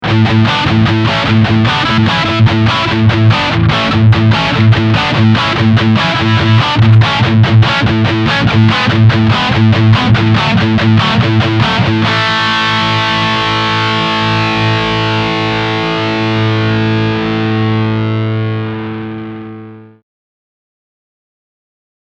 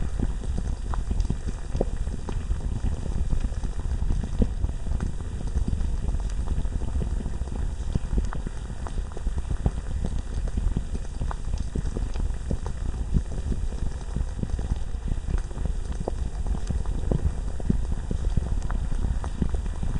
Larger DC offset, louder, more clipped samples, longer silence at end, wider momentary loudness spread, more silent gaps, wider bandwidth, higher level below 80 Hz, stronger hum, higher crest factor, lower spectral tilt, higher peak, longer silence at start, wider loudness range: neither; first, -10 LUFS vs -31 LUFS; first, 0.1% vs under 0.1%; first, 2.2 s vs 0 s; about the same, 5 LU vs 4 LU; neither; second, 7.6 kHz vs 10.5 kHz; second, -34 dBFS vs -28 dBFS; neither; second, 10 dB vs 20 dB; about the same, -6.5 dB/octave vs -7 dB/octave; first, 0 dBFS vs -6 dBFS; about the same, 0 s vs 0 s; first, 7 LU vs 2 LU